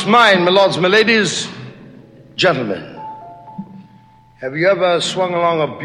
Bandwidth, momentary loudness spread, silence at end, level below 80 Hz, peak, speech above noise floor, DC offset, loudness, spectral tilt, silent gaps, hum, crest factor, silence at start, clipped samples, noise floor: 12 kHz; 23 LU; 0 s; -60 dBFS; 0 dBFS; 32 dB; under 0.1%; -14 LUFS; -4 dB/octave; none; none; 16 dB; 0 s; under 0.1%; -46 dBFS